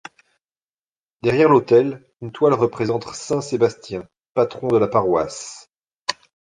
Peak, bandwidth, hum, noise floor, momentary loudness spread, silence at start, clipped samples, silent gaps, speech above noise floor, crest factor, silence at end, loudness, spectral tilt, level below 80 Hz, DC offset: -2 dBFS; 9.8 kHz; none; under -90 dBFS; 18 LU; 1.25 s; under 0.1%; 4.29-4.35 s, 6.00-6.05 s; over 71 dB; 18 dB; 0.4 s; -19 LUFS; -6 dB/octave; -56 dBFS; under 0.1%